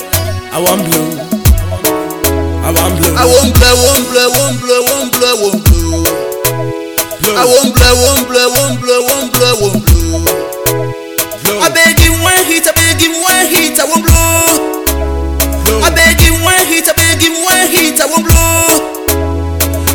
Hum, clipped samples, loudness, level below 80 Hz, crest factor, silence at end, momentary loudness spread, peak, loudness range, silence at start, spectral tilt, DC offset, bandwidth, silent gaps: none; 0.7%; -9 LUFS; -18 dBFS; 10 dB; 0 s; 8 LU; 0 dBFS; 3 LU; 0 s; -3.5 dB/octave; under 0.1%; over 20 kHz; none